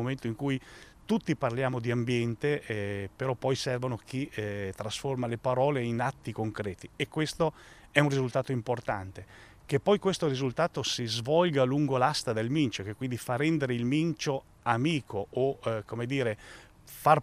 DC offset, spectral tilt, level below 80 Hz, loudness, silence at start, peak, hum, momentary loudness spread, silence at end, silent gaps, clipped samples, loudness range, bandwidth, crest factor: under 0.1%; -5.5 dB/octave; -60 dBFS; -30 LUFS; 0 s; -6 dBFS; none; 9 LU; 0 s; none; under 0.1%; 4 LU; 15.5 kHz; 24 dB